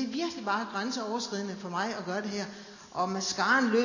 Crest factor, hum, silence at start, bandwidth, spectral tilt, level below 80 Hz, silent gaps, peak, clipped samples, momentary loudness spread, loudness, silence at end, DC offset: 18 dB; none; 0 s; 7.4 kHz; -3.5 dB/octave; -72 dBFS; none; -12 dBFS; under 0.1%; 11 LU; -31 LUFS; 0 s; under 0.1%